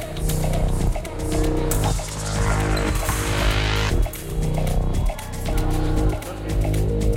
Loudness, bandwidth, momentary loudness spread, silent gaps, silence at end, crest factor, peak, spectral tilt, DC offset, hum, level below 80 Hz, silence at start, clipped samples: -23 LUFS; 17 kHz; 5 LU; none; 0 s; 14 dB; -6 dBFS; -5 dB/octave; under 0.1%; none; -24 dBFS; 0 s; under 0.1%